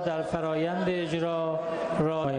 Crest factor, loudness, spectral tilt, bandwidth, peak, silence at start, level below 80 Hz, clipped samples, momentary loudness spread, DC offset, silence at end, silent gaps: 14 dB; -29 LUFS; -7 dB/octave; 10 kHz; -14 dBFS; 0 s; -58 dBFS; under 0.1%; 2 LU; under 0.1%; 0 s; none